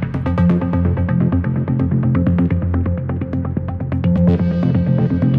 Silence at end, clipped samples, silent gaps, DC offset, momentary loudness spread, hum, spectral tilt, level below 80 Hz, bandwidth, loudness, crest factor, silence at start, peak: 0 s; under 0.1%; none; under 0.1%; 6 LU; none; -11.5 dB/octave; -32 dBFS; 4.5 kHz; -17 LUFS; 14 dB; 0 s; -2 dBFS